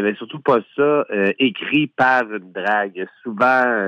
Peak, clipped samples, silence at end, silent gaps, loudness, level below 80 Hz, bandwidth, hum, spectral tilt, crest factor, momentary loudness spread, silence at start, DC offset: -4 dBFS; under 0.1%; 0 s; none; -18 LUFS; -68 dBFS; 7.2 kHz; none; -6.5 dB/octave; 16 dB; 10 LU; 0 s; under 0.1%